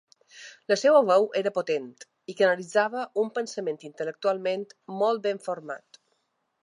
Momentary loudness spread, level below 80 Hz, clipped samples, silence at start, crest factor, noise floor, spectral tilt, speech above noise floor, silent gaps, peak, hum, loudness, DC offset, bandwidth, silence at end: 21 LU; -84 dBFS; under 0.1%; 0.35 s; 20 dB; -75 dBFS; -4 dB/octave; 49 dB; none; -6 dBFS; none; -26 LUFS; under 0.1%; 11 kHz; 0.9 s